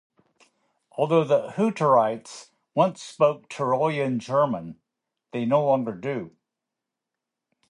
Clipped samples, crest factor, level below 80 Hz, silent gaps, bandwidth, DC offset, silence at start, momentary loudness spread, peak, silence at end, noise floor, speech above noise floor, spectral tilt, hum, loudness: under 0.1%; 20 dB; -72 dBFS; none; 11 kHz; under 0.1%; 0.95 s; 15 LU; -6 dBFS; 1.4 s; -86 dBFS; 62 dB; -6.5 dB/octave; none; -24 LUFS